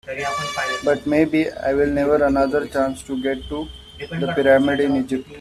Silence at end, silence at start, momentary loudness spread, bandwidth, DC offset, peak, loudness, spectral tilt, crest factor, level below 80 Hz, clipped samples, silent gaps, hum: 0 s; 0.05 s; 11 LU; 13.5 kHz; under 0.1%; -4 dBFS; -20 LUFS; -5.5 dB/octave; 16 dB; -44 dBFS; under 0.1%; none; none